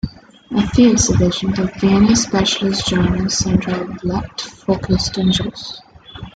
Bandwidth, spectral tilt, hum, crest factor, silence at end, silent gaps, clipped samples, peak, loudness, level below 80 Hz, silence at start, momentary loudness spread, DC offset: 9.4 kHz; -4.5 dB/octave; none; 16 dB; 0.05 s; none; under 0.1%; -2 dBFS; -16 LUFS; -34 dBFS; 0.05 s; 14 LU; under 0.1%